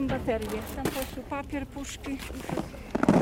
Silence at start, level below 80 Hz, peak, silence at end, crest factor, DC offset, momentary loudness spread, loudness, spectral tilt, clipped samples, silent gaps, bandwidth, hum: 0 s; -44 dBFS; -6 dBFS; 0 s; 24 dB; under 0.1%; 8 LU; -32 LUFS; -6 dB/octave; under 0.1%; none; 17 kHz; none